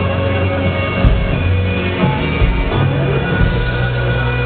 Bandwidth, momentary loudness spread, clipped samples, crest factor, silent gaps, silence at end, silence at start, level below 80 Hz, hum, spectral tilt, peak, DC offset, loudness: 4.5 kHz; 2 LU; under 0.1%; 14 dB; none; 0 s; 0 s; -20 dBFS; none; -10.5 dB/octave; 0 dBFS; under 0.1%; -16 LUFS